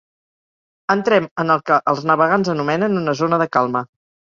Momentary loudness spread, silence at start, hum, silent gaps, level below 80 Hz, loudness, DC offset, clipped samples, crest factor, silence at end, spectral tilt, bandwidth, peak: 6 LU; 0.9 s; none; 1.31-1.36 s; -62 dBFS; -17 LUFS; under 0.1%; under 0.1%; 18 dB; 0.5 s; -6.5 dB/octave; 7.6 kHz; -2 dBFS